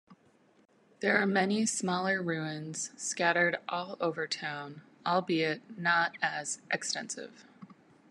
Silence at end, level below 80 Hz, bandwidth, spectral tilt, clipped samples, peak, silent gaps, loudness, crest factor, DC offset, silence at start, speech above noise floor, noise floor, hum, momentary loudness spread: 0.4 s; -82 dBFS; 12 kHz; -3.5 dB/octave; under 0.1%; -12 dBFS; none; -31 LUFS; 22 dB; under 0.1%; 0.1 s; 34 dB; -66 dBFS; none; 11 LU